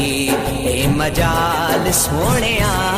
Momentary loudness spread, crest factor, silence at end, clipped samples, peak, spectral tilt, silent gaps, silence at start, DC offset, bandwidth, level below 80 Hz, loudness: 3 LU; 12 dB; 0 s; under 0.1%; -6 dBFS; -4 dB/octave; none; 0 s; under 0.1%; 15.5 kHz; -28 dBFS; -16 LUFS